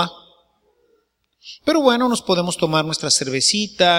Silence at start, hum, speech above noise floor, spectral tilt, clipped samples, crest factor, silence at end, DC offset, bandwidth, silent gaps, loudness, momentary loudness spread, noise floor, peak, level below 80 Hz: 0 s; none; 47 dB; -3 dB/octave; under 0.1%; 20 dB; 0 s; under 0.1%; 16.5 kHz; none; -18 LUFS; 7 LU; -65 dBFS; 0 dBFS; -58 dBFS